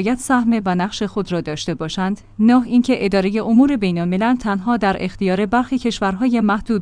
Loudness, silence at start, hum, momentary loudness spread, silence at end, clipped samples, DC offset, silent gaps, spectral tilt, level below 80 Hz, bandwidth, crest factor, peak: -18 LUFS; 0 s; none; 8 LU; 0 s; under 0.1%; under 0.1%; none; -6 dB/octave; -42 dBFS; 10.5 kHz; 14 dB; -2 dBFS